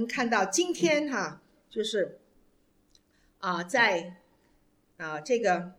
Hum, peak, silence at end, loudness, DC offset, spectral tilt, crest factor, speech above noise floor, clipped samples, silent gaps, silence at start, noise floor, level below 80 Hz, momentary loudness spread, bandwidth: none; -10 dBFS; 0.05 s; -28 LUFS; under 0.1%; -3 dB/octave; 20 dB; 38 dB; under 0.1%; none; 0 s; -67 dBFS; -72 dBFS; 13 LU; 16 kHz